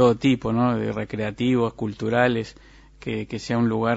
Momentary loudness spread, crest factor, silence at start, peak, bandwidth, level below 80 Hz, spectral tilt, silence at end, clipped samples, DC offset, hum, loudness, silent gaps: 9 LU; 18 dB; 0 s; -4 dBFS; 8 kHz; -50 dBFS; -7 dB/octave; 0 s; under 0.1%; under 0.1%; none; -23 LUFS; none